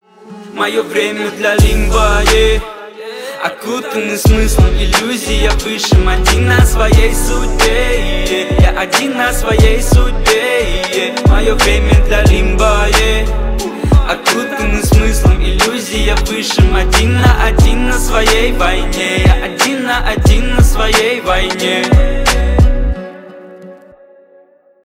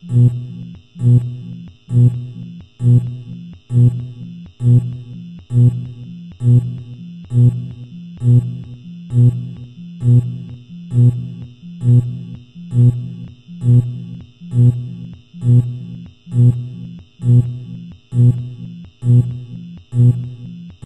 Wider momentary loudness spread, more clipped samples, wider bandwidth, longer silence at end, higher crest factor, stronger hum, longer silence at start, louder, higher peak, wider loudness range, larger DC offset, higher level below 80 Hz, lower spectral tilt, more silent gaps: second, 7 LU vs 19 LU; neither; first, 16.5 kHz vs 3.7 kHz; first, 1.1 s vs 0.15 s; about the same, 10 dB vs 14 dB; neither; first, 0.25 s vs 0.05 s; first, -12 LUFS vs -16 LUFS; about the same, 0 dBFS vs -2 dBFS; about the same, 2 LU vs 1 LU; neither; first, -14 dBFS vs -46 dBFS; second, -4.5 dB/octave vs -10.5 dB/octave; neither